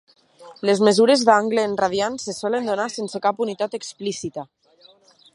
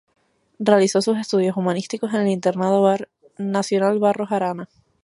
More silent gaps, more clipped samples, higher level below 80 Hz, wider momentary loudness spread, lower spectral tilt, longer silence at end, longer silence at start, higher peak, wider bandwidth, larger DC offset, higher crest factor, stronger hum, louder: neither; neither; first, -66 dBFS vs -72 dBFS; first, 13 LU vs 9 LU; second, -4 dB/octave vs -5.5 dB/octave; first, 0.9 s vs 0.4 s; second, 0.4 s vs 0.6 s; about the same, -2 dBFS vs -2 dBFS; about the same, 11.5 kHz vs 11.5 kHz; neither; about the same, 20 dB vs 20 dB; neither; about the same, -21 LUFS vs -20 LUFS